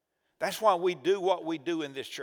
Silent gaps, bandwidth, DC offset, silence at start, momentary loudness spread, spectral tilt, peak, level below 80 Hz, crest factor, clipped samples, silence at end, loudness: none; over 20 kHz; under 0.1%; 0.4 s; 9 LU; -4 dB/octave; -10 dBFS; -82 dBFS; 20 dB; under 0.1%; 0 s; -29 LUFS